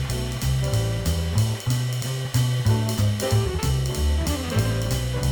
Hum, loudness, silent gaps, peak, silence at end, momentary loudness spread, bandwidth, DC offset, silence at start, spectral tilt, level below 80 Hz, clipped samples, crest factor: none; -24 LUFS; none; -8 dBFS; 0 s; 3 LU; over 20 kHz; under 0.1%; 0 s; -5.5 dB/octave; -30 dBFS; under 0.1%; 14 dB